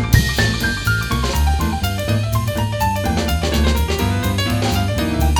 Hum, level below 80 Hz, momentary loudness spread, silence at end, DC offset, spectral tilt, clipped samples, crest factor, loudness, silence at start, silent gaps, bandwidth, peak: none; -22 dBFS; 3 LU; 0 s; under 0.1%; -5 dB/octave; under 0.1%; 16 dB; -18 LUFS; 0 s; none; over 20 kHz; 0 dBFS